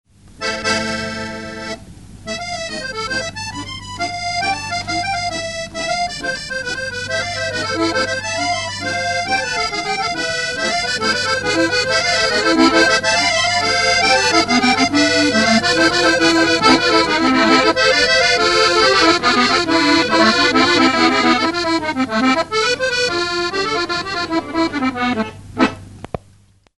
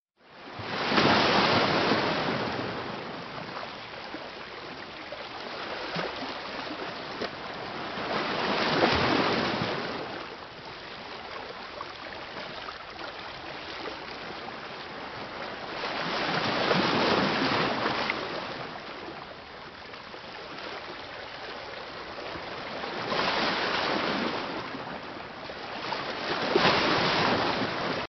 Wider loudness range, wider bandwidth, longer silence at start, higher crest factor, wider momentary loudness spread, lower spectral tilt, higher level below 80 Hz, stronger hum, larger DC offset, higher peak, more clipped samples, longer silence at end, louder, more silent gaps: about the same, 9 LU vs 11 LU; first, 12 kHz vs 6.4 kHz; first, 0.4 s vs 0.25 s; second, 16 dB vs 22 dB; second, 12 LU vs 16 LU; about the same, -2.5 dB/octave vs -2 dB/octave; first, -44 dBFS vs -58 dBFS; neither; first, 0.3% vs under 0.1%; first, 0 dBFS vs -8 dBFS; neither; first, 0.65 s vs 0 s; first, -15 LUFS vs -29 LUFS; neither